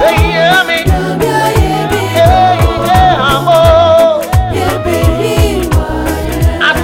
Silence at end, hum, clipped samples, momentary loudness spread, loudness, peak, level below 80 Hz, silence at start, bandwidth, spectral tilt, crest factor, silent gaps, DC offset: 0 s; none; 0.2%; 6 LU; -10 LUFS; 0 dBFS; -18 dBFS; 0 s; 17 kHz; -5.5 dB/octave; 8 dB; none; under 0.1%